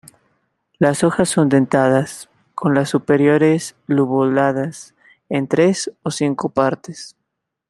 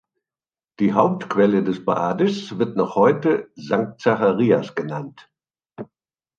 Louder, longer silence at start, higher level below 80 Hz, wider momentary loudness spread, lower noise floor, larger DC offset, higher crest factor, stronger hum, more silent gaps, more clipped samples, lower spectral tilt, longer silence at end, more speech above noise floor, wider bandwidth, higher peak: first, -17 LUFS vs -20 LUFS; about the same, 0.8 s vs 0.8 s; first, -58 dBFS vs -64 dBFS; about the same, 14 LU vs 15 LU; second, -77 dBFS vs under -90 dBFS; neither; about the same, 16 dB vs 18 dB; neither; neither; neither; second, -6 dB/octave vs -7.5 dB/octave; about the same, 0.6 s vs 0.55 s; second, 60 dB vs over 70 dB; first, 12.5 kHz vs 7.6 kHz; about the same, -2 dBFS vs -2 dBFS